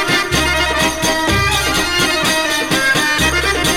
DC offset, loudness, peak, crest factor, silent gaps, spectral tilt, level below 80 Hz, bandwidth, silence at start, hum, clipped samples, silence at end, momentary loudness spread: under 0.1%; -14 LUFS; -2 dBFS; 14 dB; none; -2.5 dB/octave; -30 dBFS; 18 kHz; 0 s; none; under 0.1%; 0 s; 2 LU